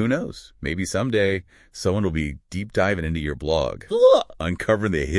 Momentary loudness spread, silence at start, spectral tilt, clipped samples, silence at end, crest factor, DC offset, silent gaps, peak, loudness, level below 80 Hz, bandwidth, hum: 13 LU; 0 s; -6 dB/octave; under 0.1%; 0 s; 18 dB; under 0.1%; none; -4 dBFS; -22 LUFS; -40 dBFS; 12 kHz; none